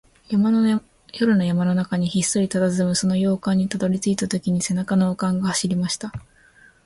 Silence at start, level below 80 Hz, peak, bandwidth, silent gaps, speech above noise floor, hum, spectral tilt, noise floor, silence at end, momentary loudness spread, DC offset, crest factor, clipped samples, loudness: 0.3 s; -54 dBFS; -6 dBFS; 11.5 kHz; none; 32 dB; none; -5.5 dB/octave; -53 dBFS; 0.65 s; 6 LU; under 0.1%; 16 dB; under 0.1%; -21 LUFS